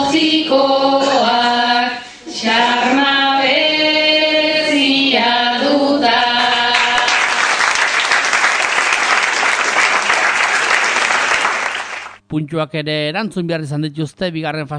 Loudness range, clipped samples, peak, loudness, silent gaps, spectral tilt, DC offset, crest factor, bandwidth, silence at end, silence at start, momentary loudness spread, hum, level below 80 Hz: 4 LU; under 0.1%; 0 dBFS; -13 LUFS; none; -2.5 dB/octave; under 0.1%; 14 dB; 10 kHz; 0 s; 0 s; 9 LU; none; -56 dBFS